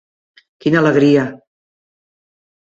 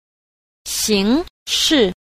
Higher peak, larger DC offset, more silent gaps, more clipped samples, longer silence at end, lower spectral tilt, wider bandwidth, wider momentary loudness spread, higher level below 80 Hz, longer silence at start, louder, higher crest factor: about the same, -2 dBFS vs -4 dBFS; neither; second, none vs 1.30-1.46 s; neither; first, 1.35 s vs 0.25 s; first, -7.5 dB/octave vs -3 dB/octave; second, 7.8 kHz vs 15.5 kHz; about the same, 11 LU vs 9 LU; second, -58 dBFS vs -44 dBFS; about the same, 0.65 s vs 0.65 s; first, -14 LUFS vs -17 LUFS; about the same, 16 dB vs 16 dB